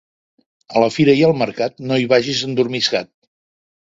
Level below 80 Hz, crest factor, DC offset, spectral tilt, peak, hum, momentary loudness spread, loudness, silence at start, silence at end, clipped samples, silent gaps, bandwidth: -58 dBFS; 18 dB; under 0.1%; -5 dB/octave; 0 dBFS; none; 8 LU; -17 LUFS; 0.7 s; 0.95 s; under 0.1%; none; 7.8 kHz